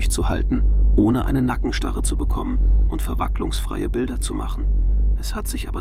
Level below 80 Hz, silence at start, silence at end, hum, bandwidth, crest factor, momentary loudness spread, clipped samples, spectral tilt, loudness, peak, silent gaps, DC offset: -20 dBFS; 0 s; 0 s; none; 15 kHz; 14 dB; 7 LU; under 0.1%; -6 dB/octave; -22 LUFS; -4 dBFS; none; under 0.1%